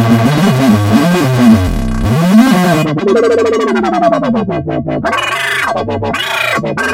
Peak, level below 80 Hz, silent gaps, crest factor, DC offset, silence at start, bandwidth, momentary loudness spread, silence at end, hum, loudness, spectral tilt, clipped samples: 0 dBFS; -28 dBFS; none; 10 dB; under 0.1%; 0 s; 16.5 kHz; 8 LU; 0 s; none; -11 LUFS; -6 dB/octave; 0.4%